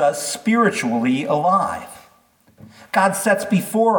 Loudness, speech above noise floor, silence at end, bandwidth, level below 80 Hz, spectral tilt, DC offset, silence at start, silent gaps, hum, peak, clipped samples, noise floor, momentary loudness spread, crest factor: -19 LUFS; 38 dB; 0 s; 19 kHz; -64 dBFS; -4.5 dB/octave; under 0.1%; 0 s; none; none; -4 dBFS; under 0.1%; -56 dBFS; 6 LU; 16 dB